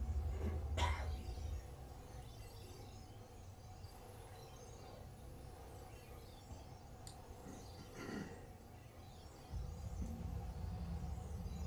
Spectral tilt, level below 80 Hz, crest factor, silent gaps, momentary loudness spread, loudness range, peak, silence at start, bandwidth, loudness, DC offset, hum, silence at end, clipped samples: -5.5 dB/octave; -50 dBFS; 22 dB; none; 14 LU; 9 LU; -26 dBFS; 0 s; over 20 kHz; -50 LUFS; under 0.1%; none; 0 s; under 0.1%